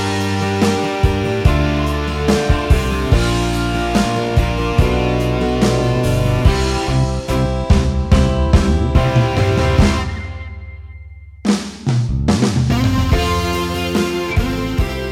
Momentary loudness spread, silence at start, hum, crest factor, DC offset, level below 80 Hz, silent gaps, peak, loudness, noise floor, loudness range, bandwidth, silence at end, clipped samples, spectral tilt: 5 LU; 0 s; none; 16 dB; under 0.1%; -22 dBFS; none; 0 dBFS; -16 LUFS; -35 dBFS; 3 LU; 16 kHz; 0 s; under 0.1%; -6 dB/octave